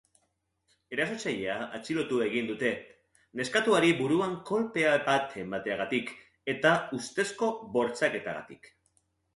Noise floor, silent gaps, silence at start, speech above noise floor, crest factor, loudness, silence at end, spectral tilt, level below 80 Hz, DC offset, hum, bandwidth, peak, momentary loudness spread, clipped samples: -77 dBFS; none; 0.9 s; 48 dB; 22 dB; -29 LUFS; 0.7 s; -4.5 dB/octave; -70 dBFS; under 0.1%; none; 11.5 kHz; -8 dBFS; 12 LU; under 0.1%